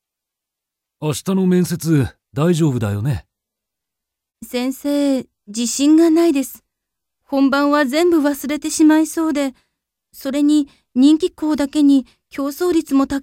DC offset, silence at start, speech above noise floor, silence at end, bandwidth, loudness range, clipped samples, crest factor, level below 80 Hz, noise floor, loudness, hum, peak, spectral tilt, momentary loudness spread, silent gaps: under 0.1%; 1 s; 67 dB; 0 s; 16.5 kHz; 5 LU; under 0.1%; 14 dB; -50 dBFS; -83 dBFS; -17 LUFS; none; -2 dBFS; -5.5 dB/octave; 11 LU; none